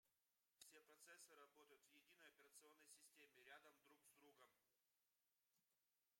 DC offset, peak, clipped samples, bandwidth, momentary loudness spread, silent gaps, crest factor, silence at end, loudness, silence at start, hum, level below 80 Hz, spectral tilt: under 0.1%; -50 dBFS; under 0.1%; 16 kHz; 3 LU; none; 24 dB; 0 s; -68 LUFS; 0.05 s; none; under -90 dBFS; 0 dB/octave